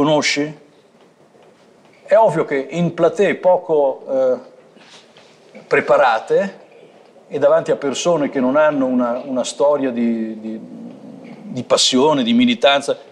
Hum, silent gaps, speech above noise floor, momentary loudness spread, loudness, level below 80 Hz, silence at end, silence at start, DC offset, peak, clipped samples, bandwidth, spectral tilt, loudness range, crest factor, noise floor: none; none; 34 dB; 16 LU; -16 LUFS; -66 dBFS; 0.1 s; 0 s; under 0.1%; -2 dBFS; under 0.1%; 11.5 kHz; -4 dB/octave; 2 LU; 14 dB; -50 dBFS